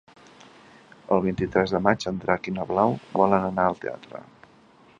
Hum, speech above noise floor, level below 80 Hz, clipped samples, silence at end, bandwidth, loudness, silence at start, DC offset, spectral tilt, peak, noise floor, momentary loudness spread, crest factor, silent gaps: none; 31 dB; -54 dBFS; under 0.1%; 0.8 s; 7.6 kHz; -24 LUFS; 1.1 s; under 0.1%; -7 dB/octave; -2 dBFS; -55 dBFS; 13 LU; 24 dB; none